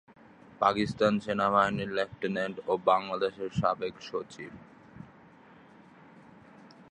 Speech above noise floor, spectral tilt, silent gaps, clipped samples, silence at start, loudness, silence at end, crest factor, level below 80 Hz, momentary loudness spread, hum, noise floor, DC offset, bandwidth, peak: 26 dB; -6 dB/octave; none; under 0.1%; 0.6 s; -29 LUFS; 0.25 s; 22 dB; -62 dBFS; 19 LU; none; -55 dBFS; under 0.1%; 10 kHz; -10 dBFS